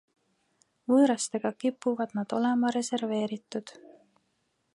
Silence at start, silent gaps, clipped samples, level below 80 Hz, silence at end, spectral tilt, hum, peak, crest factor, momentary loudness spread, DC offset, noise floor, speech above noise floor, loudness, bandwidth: 0.9 s; none; under 0.1%; -82 dBFS; 1.05 s; -4.5 dB/octave; none; -12 dBFS; 18 dB; 15 LU; under 0.1%; -75 dBFS; 48 dB; -28 LUFS; 11.5 kHz